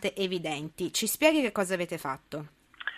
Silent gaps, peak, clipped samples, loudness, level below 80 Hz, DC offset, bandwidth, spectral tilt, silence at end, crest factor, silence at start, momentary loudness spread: none; -8 dBFS; under 0.1%; -29 LUFS; -66 dBFS; under 0.1%; 15 kHz; -3.5 dB/octave; 0 s; 22 dB; 0 s; 16 LU